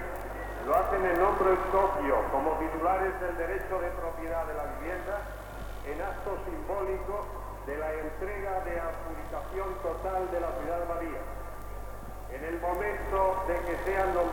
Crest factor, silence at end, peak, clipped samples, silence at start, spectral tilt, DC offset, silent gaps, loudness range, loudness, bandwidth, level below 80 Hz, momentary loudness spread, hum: 18 dB; 0 s; -14 dBFS; under 0.1%; 0 s; -6.5 dB/octave; under 0.1%; none; 8 LU; -32 LUFS; 19 kHz; -42 dBFS; 14 LU; none